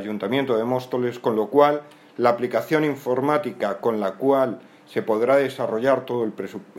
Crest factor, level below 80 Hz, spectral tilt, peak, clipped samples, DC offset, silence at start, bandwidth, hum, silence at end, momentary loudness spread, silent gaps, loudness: 18 dB; -74 dBFS; -6.5 dB/octave; -4 dBFS; under 0.1%; under 0.1%; 0 s; 16.5 kHz; none; 0 s; 9 LU; none; -22 LUFS